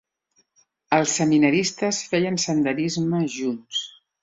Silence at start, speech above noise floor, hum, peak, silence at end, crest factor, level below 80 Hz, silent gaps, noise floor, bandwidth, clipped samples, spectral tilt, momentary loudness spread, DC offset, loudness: 0.9 s; 46 dB; none; -4 dBFS; 0.3 s; 20 dB; -64 dBFS; none; -67 dBFS; 8 kHz; under 0.1%; -4 dB/octave; 10 LU; under 0.1%; -22 LUFS